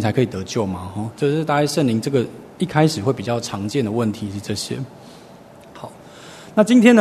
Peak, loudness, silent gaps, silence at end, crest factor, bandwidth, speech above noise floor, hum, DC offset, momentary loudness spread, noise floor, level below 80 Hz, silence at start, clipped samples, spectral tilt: 0 dBFS; -20 LUFS; none; 0 s; 20 dB; 13.5 kHz; 24 dB; none; under 0.1%; 20 LU; -43 dBFS; -56 dBFS; 0 s; under 0.1%; -6 dB/octave